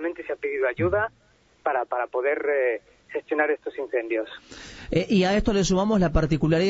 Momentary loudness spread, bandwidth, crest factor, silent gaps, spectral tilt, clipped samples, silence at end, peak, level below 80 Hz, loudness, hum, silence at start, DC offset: 12 LU; 8 kHz; 18 dB; none; -6 dB/octave; under 0.1%; 0 s; -8 dBFS; -40 dBFS; -25 LUFS; none; 0 s; under 0.1%